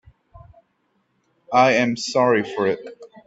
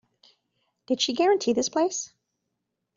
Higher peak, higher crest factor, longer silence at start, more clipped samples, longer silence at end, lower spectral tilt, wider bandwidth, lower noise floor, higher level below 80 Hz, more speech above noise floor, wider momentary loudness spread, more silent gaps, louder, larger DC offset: first, -4 dBFS vs -10 dBFS; about the same, 18 dB vs 16 dB; second, 0.35 s vs 0.9 s; neither; second, 0.2 s vs 0.9 s; first, -4.5 dB/octave vs -2.5 dB/octave; about the same, 8 kHz vs 7.8 kHz; second, -68 dBFS vs -81 dBFS; first, -60 dBFS vs -72 dBFS; second, 49 dB vs 57 dB; about the same, 10 LU vs 11 LU; neither; first, -19 LUFS vs -25 LUFS; neither